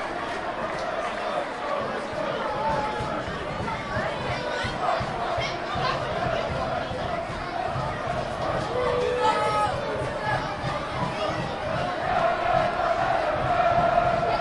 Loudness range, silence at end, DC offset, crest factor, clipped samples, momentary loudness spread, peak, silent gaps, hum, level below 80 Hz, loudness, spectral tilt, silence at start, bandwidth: 4 LU; 0 s; under 0.1%; 16 dB; under 0.1%; 7 LU; -10 dBFS; none; none; -46 dBFS; -26 LUFS; -5.5 dB/octave; 0 s; 11.5 kHz